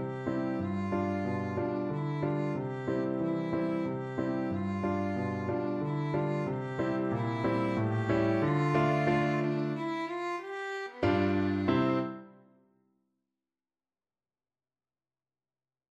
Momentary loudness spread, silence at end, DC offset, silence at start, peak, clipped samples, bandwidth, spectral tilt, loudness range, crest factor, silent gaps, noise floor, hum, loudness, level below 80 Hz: 7 LU; 3.6 s; under 0.1%; 0 s; -12 dBFS; under 0.1%; 8.4 kHz; -8.5 dB/octave; 3 LU; 18 dB; none; under -90 dBFS; none; -31 LUFS; -62 dBFS